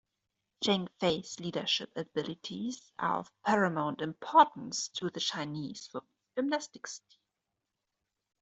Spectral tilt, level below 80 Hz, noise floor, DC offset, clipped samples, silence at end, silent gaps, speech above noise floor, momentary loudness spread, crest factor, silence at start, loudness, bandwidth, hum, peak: -4 dB/octave; -74 dBFS; -87 dBFS; under 0.1%; under 0.1%; 1.45 s; none; 54 dB; 14 LU; 26 dB; 0.6 s; -32 LUFS; 8.2 kHz; none; -8 dBFS